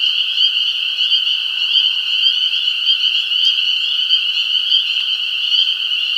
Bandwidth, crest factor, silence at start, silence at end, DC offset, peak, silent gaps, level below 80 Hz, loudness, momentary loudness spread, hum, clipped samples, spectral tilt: 16.5 kHz; 16 dB; 0 s; 0 s; under 0.1%; 0 dBFS; none; -78 dBFS; -13 LUFS; 3 LU; none; under 0.1%; 4 dB/octave